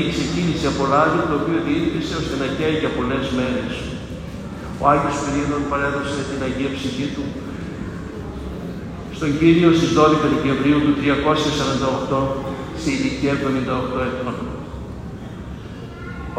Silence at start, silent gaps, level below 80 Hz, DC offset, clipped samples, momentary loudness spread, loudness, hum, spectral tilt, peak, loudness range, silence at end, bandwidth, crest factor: 0 s; none; -38 dBFS; under 0.1%; under 0.1%; 16 LU; -20 LUFS; none; -6 dB/octave; -2 dBFS; 8 LU; 0 s; 14 kHz; 20 dB